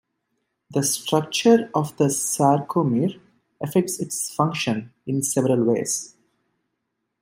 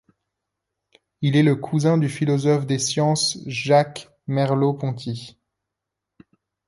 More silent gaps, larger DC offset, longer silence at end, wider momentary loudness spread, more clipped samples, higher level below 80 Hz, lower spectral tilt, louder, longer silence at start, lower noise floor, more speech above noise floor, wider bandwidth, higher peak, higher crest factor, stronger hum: neither; neither; second, 1.15 s vs 1.4 s; about the same, 9 LU vs 10 LU; neither; about the same, -66 dBFS vs -64 dBFS; about the same, -4.5 dB/octave vs -5.5 dB/octave; about the same, -22 LUFS vs -21 LUFS; second, 0.7 s vs 1.2 s; second, -78 dBFS vs -84 dBFS; second, 56 dB vs 63 dB; first, 16 kHz vs 11.5 kHz; about the same, -4 dBFS vs -4 dBFS; about the same, 20 dB vs 18 dB; neither